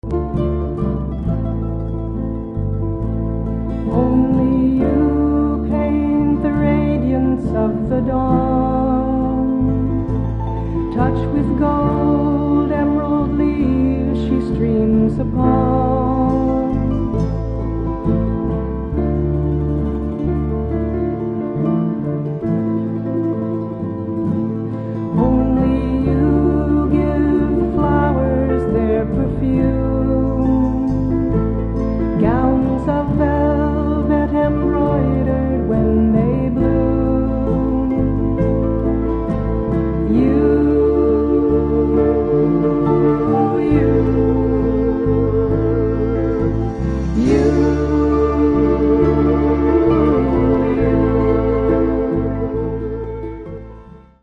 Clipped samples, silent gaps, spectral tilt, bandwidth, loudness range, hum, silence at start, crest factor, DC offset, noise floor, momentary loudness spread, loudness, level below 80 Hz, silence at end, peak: under 0.1%; none; -10.5 dB/octave; 6.6 kHz; 5 LU; none; 0.05 s; 14 dB; under 0.1%; -39 dBFS; 7 LU; -17 LUFS; -26 dBFS; 0.25 s; -2 dBFS